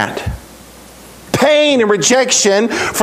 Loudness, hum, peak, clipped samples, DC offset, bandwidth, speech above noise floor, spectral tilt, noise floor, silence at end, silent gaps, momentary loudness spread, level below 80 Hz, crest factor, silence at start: -12 LUFS; none; 0 dBFS; under 0.1%; under 0.1%; 16 kHz; 25 dB; -2.5 dB/octave; -37 dBFS; 0 s; none; 14 LU; -38 dBFS; 14 dB; 0 s